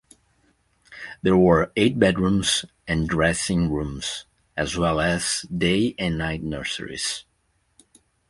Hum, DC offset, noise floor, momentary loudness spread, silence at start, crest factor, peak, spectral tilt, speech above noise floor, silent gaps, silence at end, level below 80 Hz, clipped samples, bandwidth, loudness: none; under 0.1%; -68 dBFS; 11 LU; 0.9 s; 22 dB; -2 dBFS; -4.5 dB/octave; 46 dB; none; 1.1 s; -42 dBFS; under 0.1%; 11.5 kHz; -22 LUFS